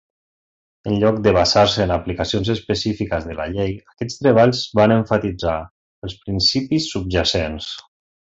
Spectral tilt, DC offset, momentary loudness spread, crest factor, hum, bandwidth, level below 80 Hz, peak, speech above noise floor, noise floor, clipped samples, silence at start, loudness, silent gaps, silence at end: -5.5 dB/octave; under 0.1%; 15 LU; 18 dB; none; 8 kHz; -38 dBFS; -2 dBFS; over 72 dB; under -90 dBFS; under 0.1%; 0.85 s; -18 LUFS; 5.71-6.02 s; 0.45 s